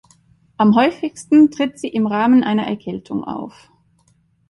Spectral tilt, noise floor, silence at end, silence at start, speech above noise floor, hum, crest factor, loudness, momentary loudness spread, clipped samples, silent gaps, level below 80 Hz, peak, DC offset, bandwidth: -6.5 dB/octave; -59 dBFS; 1 s; 0.6 s; 43 dB; none; 16 dB; -17 LUFS; 14 LU; under 0.1%; none; -58 dBFS; -2 dBFS; under 0.1%; 11.5 kHz